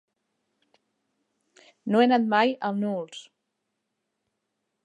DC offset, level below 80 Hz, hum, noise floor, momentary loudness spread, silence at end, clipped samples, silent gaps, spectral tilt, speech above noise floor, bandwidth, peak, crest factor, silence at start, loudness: under 0.1%; -84 dBFS; none; -80 dBFS; 19 LU; 1.65 s; under 0.1%; none; -6 dB/octave; 57 dB; 9.8 kHz; -8 dBFS; 22 dB; 1.85 s; -24 LUFS